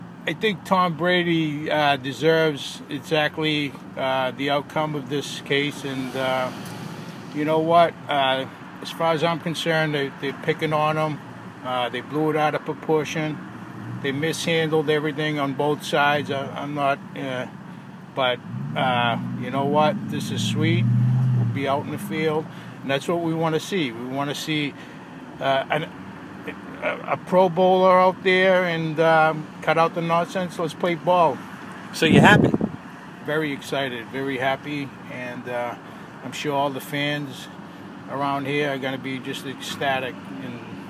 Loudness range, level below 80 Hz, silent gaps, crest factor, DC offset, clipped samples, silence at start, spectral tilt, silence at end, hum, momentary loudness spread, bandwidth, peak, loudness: 8 LU; -60 dBFS; none; 22 dB; under 0.1%; under 0.1%; 0 s; -5.5 dB/octave; 0 s; none; 16 LU; 16 kHz; 0 dBFS; -23 LUFS